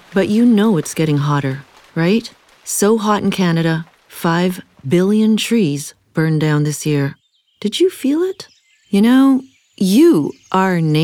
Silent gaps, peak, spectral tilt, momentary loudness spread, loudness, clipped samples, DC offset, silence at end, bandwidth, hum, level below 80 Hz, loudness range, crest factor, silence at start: none; -2 dBFS; -6 dB/octave; 12 LU; -16 LUFS; under 0.1%; under 0.1%; 0 s; 19 kHz; none; -60 dBFS; 3 LU; 14 dB; 0.1 s